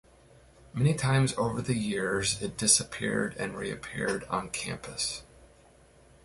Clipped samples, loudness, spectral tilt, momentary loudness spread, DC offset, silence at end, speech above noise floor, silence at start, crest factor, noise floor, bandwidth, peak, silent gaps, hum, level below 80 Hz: under 0.1%; -29 LUFS; -3.5 dB/octave; 12 LU; under 0.1%; 0.8 s; 29 dB; 0.75 s; 22 dB; -58 dBFS; 11.5 kHz; -10 dBFS; none; none; -54 dBFS